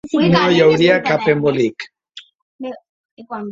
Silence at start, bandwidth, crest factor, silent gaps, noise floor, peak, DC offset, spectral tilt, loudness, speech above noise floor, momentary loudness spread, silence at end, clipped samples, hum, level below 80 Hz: 0.05 s; 7.6 kHz; 16 dB; 2.35-2.59 s, 2.89-3.17 s; -43 dBFS; -2 dBFS; under 0.1%; -6.5 dB/octave; -14 LUFS; 28 dB; 20 LU; 0 s; under 0.1%; none; -54 dBFS